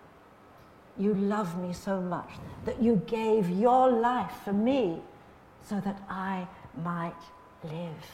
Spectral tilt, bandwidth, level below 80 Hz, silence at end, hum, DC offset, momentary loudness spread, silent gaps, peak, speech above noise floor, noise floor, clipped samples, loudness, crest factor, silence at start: -7.5 dB/octave; 15 kHz; -60 dBFS; 0 s; none; under 0.1%; 16 LU; none; -12 dBFS; 26 dB; -55 dBFS; under 0.1%; -29 LUFS; 18 dB; 0.95 s